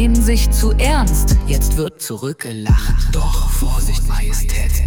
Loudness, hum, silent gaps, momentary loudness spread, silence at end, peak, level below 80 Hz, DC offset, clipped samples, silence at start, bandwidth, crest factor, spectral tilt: -18 LUFS; none; none; 8 LU; 0 s; -4 dBFS; -14 dBFS; under 0.1%; under 0.1%; 0 s; 19.5 kHz; 10 dB; -5 dB/octave